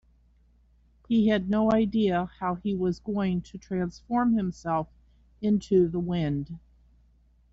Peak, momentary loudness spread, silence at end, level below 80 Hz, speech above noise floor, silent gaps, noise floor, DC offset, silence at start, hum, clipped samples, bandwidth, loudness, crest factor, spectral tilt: -12 dBFS; 9 LU; 0.95 s; -52 dBFS; 35 dB; none; -61 dBFS; under 0.1%; 1.1 s; none; under 0.1%; 7.8 kHz; -27 LUFS; 16 dB; -7 dB/octave